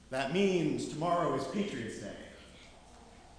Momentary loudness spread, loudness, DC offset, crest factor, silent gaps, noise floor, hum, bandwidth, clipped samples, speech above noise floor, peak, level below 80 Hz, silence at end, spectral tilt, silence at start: 22 LU; -33 LUFS; under 0.1%; 16 dB; none; -55 dBFS; none; 11 kHz; under 0.1%; 22 dB; -18 dBFS; -60 dBFS; 0.05 s; -5.5 dB/octave; 0.1 s